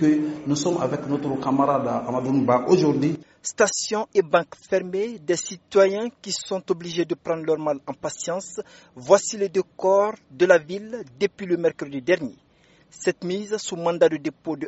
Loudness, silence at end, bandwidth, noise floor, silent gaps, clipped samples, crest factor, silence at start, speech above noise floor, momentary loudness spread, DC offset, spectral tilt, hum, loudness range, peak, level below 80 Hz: -23 LUFS; 0 s; 8 kHz; -57 dBFS; none; under 0.1%; 22 dB; 0 s; 34 dB; 10 LU; under 0.1%; -5 dB/octave; none; 3 LU; 0 dBFS; -64 dBFS